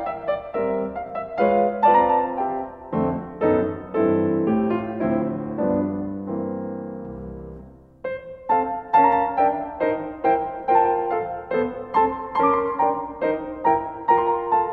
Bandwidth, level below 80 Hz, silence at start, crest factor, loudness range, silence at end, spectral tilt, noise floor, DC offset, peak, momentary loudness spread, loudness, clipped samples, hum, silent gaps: 4.6 kHz; -50 dBFS; 0 s; 16 dB; 6 LU; 0 s; -10 dB/octave; -44 dBFS; under 0.1%; -6 dBFS; 12 LU; -22 LUFS; under 0.1%; none; none